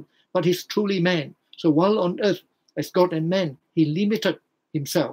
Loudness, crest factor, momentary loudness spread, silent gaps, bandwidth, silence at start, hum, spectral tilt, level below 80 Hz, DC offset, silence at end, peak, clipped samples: -23 LUFS; 18 dB; 11 LU; none; 16 kHz; 0 s; none; -6 dB/octave; -74 dBFS; under 0.1%; 0 s; -6 dBFS; under 0.1%